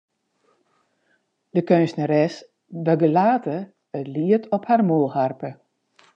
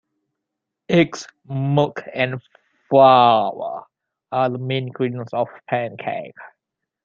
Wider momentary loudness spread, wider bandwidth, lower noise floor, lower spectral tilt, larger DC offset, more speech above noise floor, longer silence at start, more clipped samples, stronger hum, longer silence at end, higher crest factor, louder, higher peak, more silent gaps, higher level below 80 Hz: about the same, 15 LU vs 17 LU; about the same, 8 kHz vs 7.6 kHz; second, -68 dBFS vs -82 dBFS; first, -8.5 dB/octave vs -6.5 dB/octave; neither; second, 48 dB vs 63 dB; first, 1.55 s vs 0.9 s; neither; neither; about the same, 0.6 s vs 0.55 s; about the same, 20 dB vs 20 dB; about the same, -21 LUFS vs -19 LUFS; about the same, -2 dBFS vs -2 dBFS; neither; second, -78 dBFS vs -64 dBFS